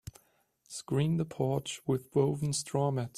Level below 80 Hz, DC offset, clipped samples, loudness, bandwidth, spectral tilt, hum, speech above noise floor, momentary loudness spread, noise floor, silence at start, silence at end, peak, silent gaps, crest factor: -64 dBFS; under 0.1%; under 0.1%; -32 LUFS; 14 kHz; -6 dB/octave; none; 39 dB; 11 LU; -70 dBFS; 0.05 s; 0.1 s; -14 dBFS; none; 18 dB